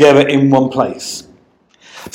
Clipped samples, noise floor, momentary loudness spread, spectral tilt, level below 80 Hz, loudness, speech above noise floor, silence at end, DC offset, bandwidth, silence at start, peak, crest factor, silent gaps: 0.4%; -51 dBFS; 18 LU; -5.5 dB/octave; -54 dBFS; -13 LUFS; 40 dB; 0.05 s; under 0.1%; 16 kHz; 0 s; 0 dBFS; 14 dB; none